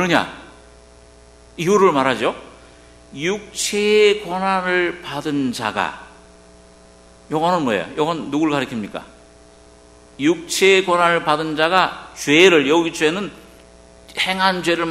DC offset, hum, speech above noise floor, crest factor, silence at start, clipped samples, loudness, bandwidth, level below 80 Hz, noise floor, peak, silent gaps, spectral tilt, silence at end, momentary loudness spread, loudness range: under 0.1%; none; 29 dB; 20 dB; 0 s; under 0.1%; -18 LUFS; 13.5 kHz; -52 dBFS; -46 dBFS; 0 dBFS; none; -4 dB/octave; 0 s; 13 LU; 7 LU